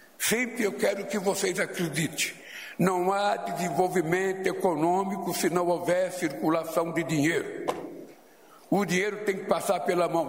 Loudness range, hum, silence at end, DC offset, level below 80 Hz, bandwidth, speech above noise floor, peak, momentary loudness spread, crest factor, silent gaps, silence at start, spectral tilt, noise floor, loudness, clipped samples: 2 LU; none; 0 s; under 0.1%; -68 dBFS; 16 kHz; 27 dB; -8 dBFS; 5 LU; 20 dB; none; 0.2 s; -4.5 dB/octave; -54 dBFS; -27 LUFS; under 0.1%